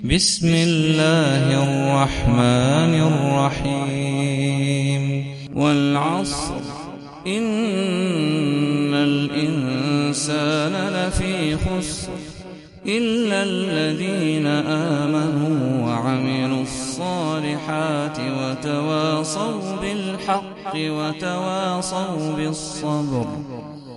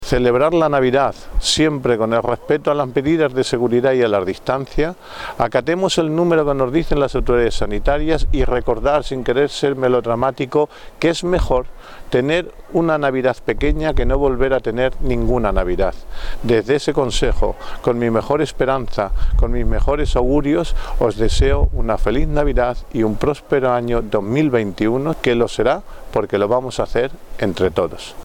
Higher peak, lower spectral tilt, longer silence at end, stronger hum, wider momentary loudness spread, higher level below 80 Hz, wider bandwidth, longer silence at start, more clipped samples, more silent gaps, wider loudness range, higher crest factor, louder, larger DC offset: about the same, -2 dBFS vs -2 dBFS; about the same, -5.5 dB/octave vs -6 dB/octave; about the same, 0 s vs 0 s; neither; first, 9 LU vs 6 LU; second, -40 dBFS vs -24 dBFS; about the same, 11.5 kHz vs 11.5 kHz; about the same, 0 s vs 0 s; neither; neither; first, 6 LU vs 2 LU; about the same, 20 dB vs 16 dB; second, -21 LUFS vs -18 LUFS; neither